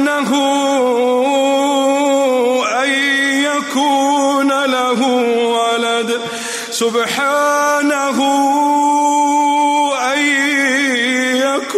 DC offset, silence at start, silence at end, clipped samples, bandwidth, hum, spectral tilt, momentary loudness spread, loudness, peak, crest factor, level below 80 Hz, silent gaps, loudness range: under 0.1%; 0 s; 0 s; under 0.1%; 15.5 kHz; none; -2 dB/octave; 3 LU; -14 LUFS; -4 dBFS; 10 dB; -72 dBFS; none; 2 LU